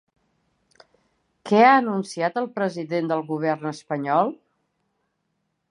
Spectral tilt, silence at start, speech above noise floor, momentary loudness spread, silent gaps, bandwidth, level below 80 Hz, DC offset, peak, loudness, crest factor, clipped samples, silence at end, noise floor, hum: -6 dB/octave; 1.45 s; 53 dB; 13 LU; none; 10.5 kHz; -78 dBFS; under 0.1%; -4 dBFS; -22 LUFS; 22 dB; under 0.1%; 1.35 s; -75 dBFS; none